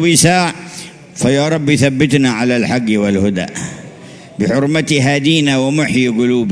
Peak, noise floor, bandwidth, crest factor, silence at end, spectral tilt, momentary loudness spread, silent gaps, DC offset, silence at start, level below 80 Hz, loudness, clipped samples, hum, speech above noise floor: 0 dBFS; -35 dBFS; 11 kHz; 14 dB; 0 s; -4.5 dB/octave; 16 LU; none; under 0.1%; 0 s; -46 dBFS; -13 LUFS; under 0.1%; none; 22 dB